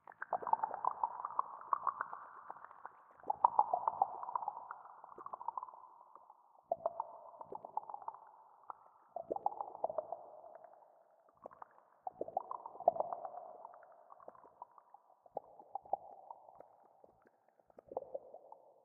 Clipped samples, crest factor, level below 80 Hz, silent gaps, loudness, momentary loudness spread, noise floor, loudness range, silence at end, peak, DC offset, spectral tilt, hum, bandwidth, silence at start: under 0.1%; 32 dB; -88 dBFS; none; -41 LUFS; 22 LU; -71 dBFS; 12 LU; 0.15 s; -12 dBFS; under 0.1%; 2 dB/octave; none; 2.8 kHz; 0.1 s